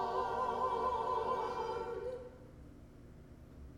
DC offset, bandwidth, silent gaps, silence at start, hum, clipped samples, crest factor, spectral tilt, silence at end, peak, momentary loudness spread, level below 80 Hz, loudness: under 0.1%; 16 kHz; none; 0 s; none; under 0.1%; 14 dB; -6 dB/octave; 0 s; -24 dBFS; 21 LU; -58 dBFS; -37 LUFS